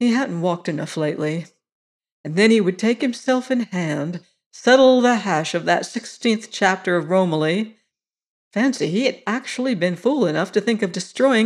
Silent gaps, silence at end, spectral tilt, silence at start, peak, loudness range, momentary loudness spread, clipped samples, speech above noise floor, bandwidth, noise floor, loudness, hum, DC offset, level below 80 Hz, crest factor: 1.72-2.00 s, 2.12-2.24 s, 4.46-4.51 s, 8.28-8.51 s; 0 s; -5 dB/octave; 0 s; -2 dBFS; 4 LU; 10 LU; under 0.1%; 58 dB; 11.5 kHz; -77 dBFS; -20 LUFS; none; under 0.1%; -72 dBFS; 16 dB